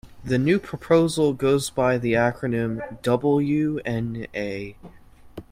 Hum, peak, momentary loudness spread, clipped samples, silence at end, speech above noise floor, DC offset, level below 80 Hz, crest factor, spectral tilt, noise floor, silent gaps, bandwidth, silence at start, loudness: none; -4 dBFS; 9 LU; under 0.1%; 0.1 s; 20 dB; under 0.1%; -50 dBFS; 18 dB; -6.5 dB/octave; -43 dBFS; none; 16 kHz; 0.05 s; -23 LUFS